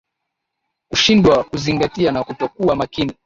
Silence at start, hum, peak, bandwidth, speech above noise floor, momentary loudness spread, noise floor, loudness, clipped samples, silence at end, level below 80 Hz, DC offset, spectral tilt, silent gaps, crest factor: 0.9 s; none; -2 dBFS; 7.6 kHz; 61 dB; 10 LU; -78 dBFS; -17 LUFS; under 0.1%; 0.15 s; -42 dBFS; under 0.1%; -5 dB/octave; none; 16 dB